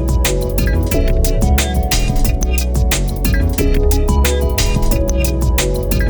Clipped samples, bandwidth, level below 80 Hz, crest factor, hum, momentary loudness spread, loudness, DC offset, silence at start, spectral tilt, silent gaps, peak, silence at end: under 0.1%; over 20 kHz; -16 dBFS; 12 dB; none; 2 LU; -16 LUFS; under 0.1%; 0 s; -5 dB/octave; none; 0 dBFS; 0 s